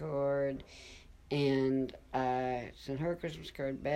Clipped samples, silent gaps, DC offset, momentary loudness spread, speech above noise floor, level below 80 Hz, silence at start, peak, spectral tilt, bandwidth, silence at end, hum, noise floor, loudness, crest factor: under 0.1%; none; under 0.1%; 13 LU; 20 dB; -58 dBFS; 0 s; -20 dBFS; -7 dB/octave; 13 kHz; 0 s; none; -54 dBFS; -35 LUFS; 16 dB